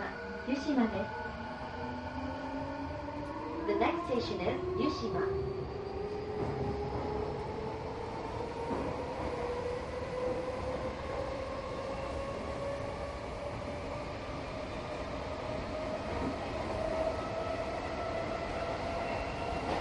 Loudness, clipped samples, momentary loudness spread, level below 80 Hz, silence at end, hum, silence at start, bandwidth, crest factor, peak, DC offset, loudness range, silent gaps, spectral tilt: -37 LUFS; under 0.1%; 7 LU; -48 dBFS; 0 s; none; 0 s; 11.5 kHz; 20 dB; -16 dBFS; under 0.1%; 4 LU; none; -6.5 dB/octave